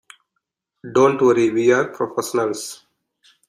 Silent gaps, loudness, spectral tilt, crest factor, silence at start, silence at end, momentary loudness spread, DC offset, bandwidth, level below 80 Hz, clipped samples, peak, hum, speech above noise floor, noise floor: none; -18 LUFS; -5 dB/octave; 18 dB; 0.85 s; 0.75 s; 10 LU; under 0.1%; 15.5 kHz; -64 dBFS; under 0.1%; -2 dBFS; none; 59 dB; -77 dBFS